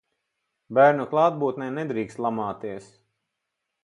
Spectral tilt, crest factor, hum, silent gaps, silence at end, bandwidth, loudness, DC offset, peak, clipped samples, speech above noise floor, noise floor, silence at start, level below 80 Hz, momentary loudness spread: -7.5 dB/octave; 20 dB; none; none; 1 s; 10.5 kHz; -23 LUFS; under 0.1%; -4 dBFS; under 0.1%; 58 dB; -82 dBFS; 0.7 s; -68 dBFS; 15 LU